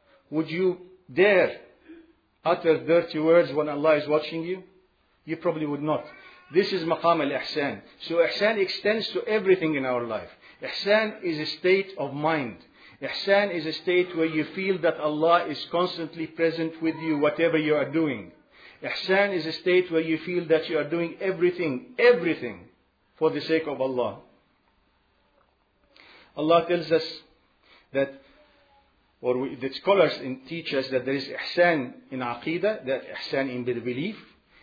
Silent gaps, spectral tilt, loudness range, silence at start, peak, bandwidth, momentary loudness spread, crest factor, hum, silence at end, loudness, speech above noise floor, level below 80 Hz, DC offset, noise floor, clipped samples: none; -7 dB/octave; 4 LU; 0.3 s; -6 dBFS; 5 kHz; 12 LU; 20 dB; none; 0.4 s; -25 LUFS; 42 dB; -70 dBFS; under 0.1%; -66 dBFS; under 0.1%